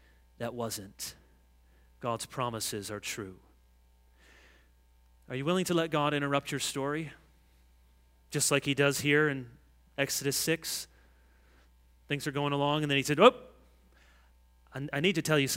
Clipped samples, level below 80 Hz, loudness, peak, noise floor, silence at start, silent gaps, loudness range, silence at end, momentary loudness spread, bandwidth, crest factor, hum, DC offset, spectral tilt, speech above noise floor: under 0.1%; -62 dBFS; -30 LUFS; -4 dBFS; -63 dBFS; 0.4 s; none; 9 LU; 0 s; 15 LU; 16 kHz; 28 dB; none; under 0.1%; -4 dB/octave; 33 dB